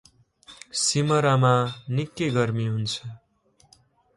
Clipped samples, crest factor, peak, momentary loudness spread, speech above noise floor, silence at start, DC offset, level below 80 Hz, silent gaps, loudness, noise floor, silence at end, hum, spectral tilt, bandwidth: under 0.1%; 18 dB; -8 dBFS; 11 LU; 40 dB; 0.5 s; under 0.1%; -62 dBFS; none; -24 LUFS; -63 dBFS; 1 s; none; -5 dB/octave; 11.5 kHz